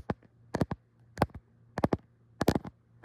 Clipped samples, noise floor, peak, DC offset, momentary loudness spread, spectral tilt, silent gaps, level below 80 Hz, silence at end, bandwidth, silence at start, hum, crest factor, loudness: under 0.1%; -52 dBFS; -10 dBFS; under 0.1%; 16 LU; -7 dB/octave; none; -50 dBFS; 0.35 s; 16 kHz; 0.1 s; none; 24 dB; -34 LUFS